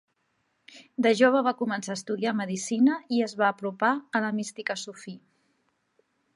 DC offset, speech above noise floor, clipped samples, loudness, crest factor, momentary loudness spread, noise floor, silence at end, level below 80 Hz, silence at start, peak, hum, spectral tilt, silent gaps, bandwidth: under 0.1%; 48 dB; under 0.1%; -26 LUFS; 20 dB; 13 LU; -74 dBFS; 1.2 s; -82 dBFS; 0.75 s; -8 dBFS; none; -4.5 dB/octave; none; 11.5 kHz